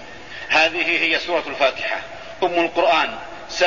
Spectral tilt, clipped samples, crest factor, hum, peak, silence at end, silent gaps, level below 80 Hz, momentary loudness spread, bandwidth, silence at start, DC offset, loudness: -2.5 dB/octave; under 0.1%; 16 dB; none; -4 dBFS; 0 s; none; -54 dBFS; 16 LU; 7.4 kHz; 0 s; 0.8%; -19 LUFS